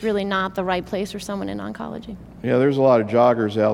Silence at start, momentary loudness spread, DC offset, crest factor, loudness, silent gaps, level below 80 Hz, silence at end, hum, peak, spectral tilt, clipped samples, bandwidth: 0 s; 15 LU; under 0.1%; 16 dB; -21 LUFS; none; -50 dBFS; 0 s; none; -4 dBFS; -6.5 dB/octave; under 0.1%; 16.5 kHz